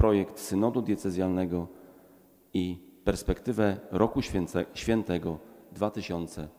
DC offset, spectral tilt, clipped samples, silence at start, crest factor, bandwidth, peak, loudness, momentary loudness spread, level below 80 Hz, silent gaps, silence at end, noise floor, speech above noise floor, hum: under 0.1%; -6.5 dB/octave; under 0.1%; 0 s; 20 dB; 16.5 kHz; -10 dBFS; -30 LUFS; 8 LU; -46 dBFS; none; 0.1 s; -58 dBFS; 29 dB; none